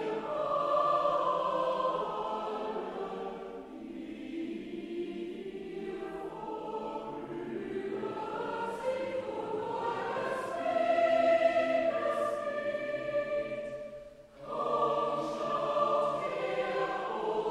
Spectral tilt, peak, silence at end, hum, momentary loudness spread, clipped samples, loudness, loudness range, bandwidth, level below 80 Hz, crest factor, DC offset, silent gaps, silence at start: -5.5 dB/octave; -16 dBFS; 0 s; none; 13 LU; under 0.1%; -33 LUFS; 10 LU; 12 kHz; -66 dBFS; 16 dB; under 0.1%; none; 0 s